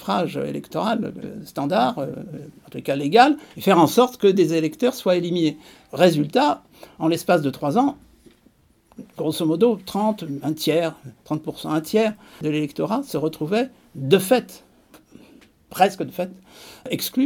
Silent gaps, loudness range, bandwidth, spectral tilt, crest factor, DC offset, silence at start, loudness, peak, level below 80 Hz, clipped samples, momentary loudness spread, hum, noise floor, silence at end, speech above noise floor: none; 5 LU; 18 kHz; -5.5 dB/octave; 22 dB; under 0.1%; 0 s; -21 LUFS; 0 dBFS; -64 dBFS; under 0.1%; 15 LU; none; -58 dBFS; 0 s; 37 dB